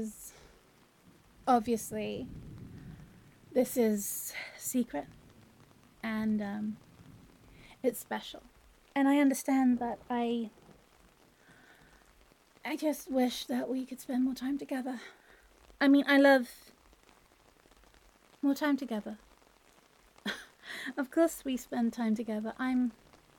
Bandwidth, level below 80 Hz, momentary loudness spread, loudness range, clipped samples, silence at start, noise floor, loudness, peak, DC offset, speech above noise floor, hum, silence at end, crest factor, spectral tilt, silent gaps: 17.5 kHz; -66 dBFS; 20 LU; 8 LU; under 0.1%; 0 s; -64 dBFS; -32 LUFS; -12 dBFS; under 0.1%; 33 dB; none; 0.45 s; 22 dB; -4.5 dB/octave; none